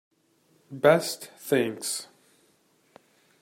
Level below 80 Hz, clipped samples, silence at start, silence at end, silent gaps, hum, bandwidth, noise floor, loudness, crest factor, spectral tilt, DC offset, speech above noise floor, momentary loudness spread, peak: -76 dBFS; under 0.1%; 0.7 s; 1.4 s; none; none; 16 kHz; -66 dBFS; -26 LUFS; 24 dB; -4 dB/octave; under 0.1%; 41 dB; 19 LU; -6 dBFS